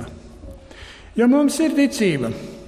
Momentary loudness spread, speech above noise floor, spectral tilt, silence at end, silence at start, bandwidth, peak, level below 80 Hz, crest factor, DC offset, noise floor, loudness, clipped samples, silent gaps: 24 LU; 23 dB; -5 dB/octave; 0 s; 0 s; 15 kHz; -6 dBFS; -46 dBFS; 16 dB; under 0.1%; -41 dBFS; -19 LUFS; under 0.1%; none